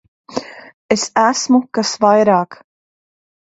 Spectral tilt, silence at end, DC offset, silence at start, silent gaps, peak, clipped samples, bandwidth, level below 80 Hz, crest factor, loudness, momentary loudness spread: -4 dB/octave; 0.9 s; under 0.1%; 0.3 s; 0.74-0.89 s; 0 dBFS; under 0.1%; 8 kHz; -60 dBFS; 16 dB; -14 LUFS; 15 LU